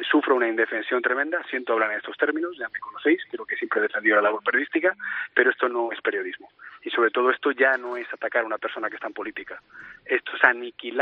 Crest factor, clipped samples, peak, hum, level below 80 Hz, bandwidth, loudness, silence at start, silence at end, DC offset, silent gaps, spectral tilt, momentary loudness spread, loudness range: 24 dB; under 0.1%; -2 dBFS; none; -76 dBFS; 5 kHz; -24 LUFS; 0 s; 0 s; under 0.1%; none; 0.5 dB/octave; 12 LU; 2 LU